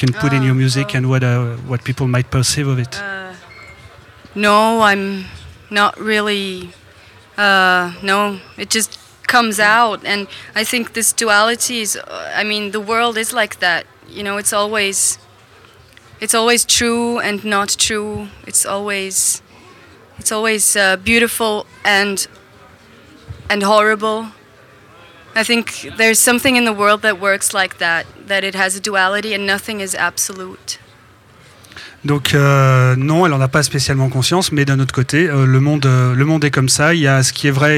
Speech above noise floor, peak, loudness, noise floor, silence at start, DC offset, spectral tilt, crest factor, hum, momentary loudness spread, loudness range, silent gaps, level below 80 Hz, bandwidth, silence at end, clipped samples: 30 dB; 0 dBFS; -15 LUFS; -45 dBFS; 0 s; under 0.1%; -3.5 dB/octave; 16 dB; none; 11 LU; 4 LU; none; -48 dBFS; 16.5 kHz; 0 s; under 0.1%